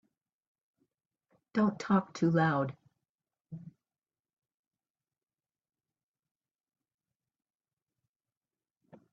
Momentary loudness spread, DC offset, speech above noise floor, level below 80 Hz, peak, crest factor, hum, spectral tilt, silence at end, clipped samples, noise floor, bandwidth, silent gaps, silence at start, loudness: 21 LU; under 0.1%; over 61 dB; -78 dBFS; -14 dBFS; 24 dB; none; -6.5 dB/octave; 5.45 s; under 0.1%; under -90 dBFS; 7.6 kHz; 3.09-3.18 s, 3.41-3.45 s; 1.55 s; -31 LUFS